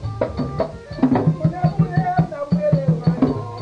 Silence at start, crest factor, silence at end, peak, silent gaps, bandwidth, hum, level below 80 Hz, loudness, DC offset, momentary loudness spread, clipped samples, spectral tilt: 0 s; 16 dB; 0 s; -4 dBFS; none; 6.4 kHz; none; -40 dBFS; -20 LUFS; under 0.1%; 7 LU; under 0.1%; -9.5 dB/octave